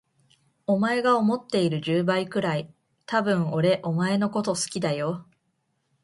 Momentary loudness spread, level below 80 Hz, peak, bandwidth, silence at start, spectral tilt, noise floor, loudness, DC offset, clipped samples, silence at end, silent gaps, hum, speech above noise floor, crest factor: 8 LU; -68 dBFS; -8 dBFS; 11.5 kHz; 0.7 s; -5.5 dB/octave; -74 dBFS; -25 LUFS; under 0.1%; under 0.1%; 0.8 s; none; none; 50 dB; 18 dB